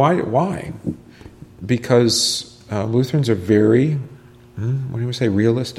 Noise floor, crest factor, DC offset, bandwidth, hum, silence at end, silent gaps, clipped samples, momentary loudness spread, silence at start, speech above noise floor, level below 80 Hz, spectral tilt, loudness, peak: -41 dBFS; 16 dB; under 0.1%; 14.5 kHz; none; 0 s; none; under 0.1%; 14 LU; 0 s; 23 dB; -52 dBFS; -5.5 dB/octave; -19 LUFS; -2 dBFS